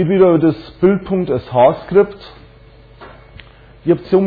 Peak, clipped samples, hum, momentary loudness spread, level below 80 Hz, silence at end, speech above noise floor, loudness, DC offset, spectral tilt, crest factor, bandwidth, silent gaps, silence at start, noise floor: -2 dBFS; under 0.1%; none; 8 LU; -44 dBFS; 0 s; 29 dB; -15 LUFS; under 0.1%; -11 dB/octave; 14 dB; 4.9 kHz; none; 0 s; -42 dBFS